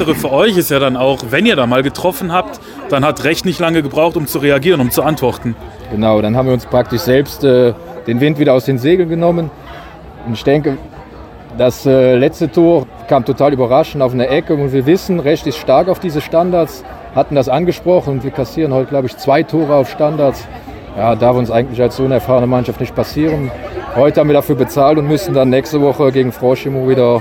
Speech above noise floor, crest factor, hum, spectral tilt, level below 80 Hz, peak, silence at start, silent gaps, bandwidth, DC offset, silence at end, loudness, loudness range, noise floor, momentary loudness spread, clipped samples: 20 dB; 12 dB; none; -6.5 dB/octave; -38 dBFS; 0 dBFS; 0 s; none; 17 kHz; under 0.1%; 0 s; -13 LUFS; 2 LU; -33 dBFS; 9 LU; under 0.1%